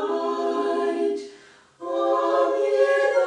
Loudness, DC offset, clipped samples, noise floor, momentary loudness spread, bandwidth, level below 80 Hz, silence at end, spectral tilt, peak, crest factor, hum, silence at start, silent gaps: -23 LUFS; under 0.1%; under 0.1%; -50 dBFS; 12 LU; 10 kHz; -76 dBFS; 0 s; -3 dB/octave; -8 dBFS; 14 dB; none; 0 s; none